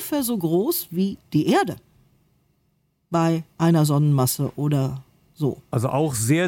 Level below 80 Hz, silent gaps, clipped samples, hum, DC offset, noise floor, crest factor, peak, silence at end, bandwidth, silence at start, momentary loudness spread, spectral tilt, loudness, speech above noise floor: -58 dBFS; none; under 0.1%; none; under 0.1%; -68 dBFS; 14 dB; -8 dBFS; 0 s; 17 kHz; 0 s; 8 LU; -6 dB/octave; -22 LUFS; 47 dB